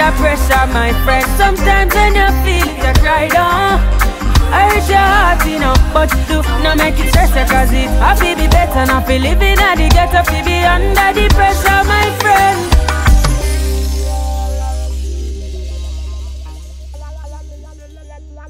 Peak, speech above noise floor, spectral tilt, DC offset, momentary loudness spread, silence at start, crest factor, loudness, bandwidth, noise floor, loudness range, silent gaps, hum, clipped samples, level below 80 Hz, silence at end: 0 dBFS; 23 dB; -4.5 dB/octave; under 0.1%; 14 LU; 0 s; 12 dB; -12 LUFS; 16.5 kHz; -33 dBFS; 11 LU; none; none; under 0.1%; -14 dBFS; 0 s